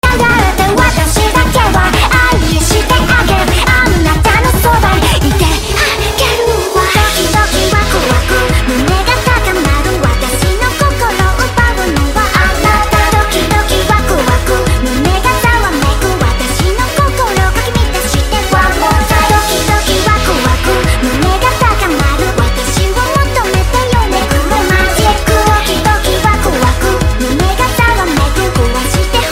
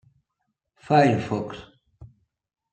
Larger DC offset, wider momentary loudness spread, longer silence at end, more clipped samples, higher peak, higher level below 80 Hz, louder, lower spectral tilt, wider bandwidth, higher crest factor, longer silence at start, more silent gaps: neither; second, 3 LU vs 18 LU; second, 0 s vs 0.65 s; neither; first, 0 dBFS vs -6 dBFS; first, -16 dBFS vs -60 dBFS; first, -10 LUFS vs -22 LUFS; second, -4 dB/octave vs -7 dB/octave; first, 16.5 kHz vs 9 kHz; second, 10 dB vs 22 dB; second, 0.05 s vs 0.9 s; neither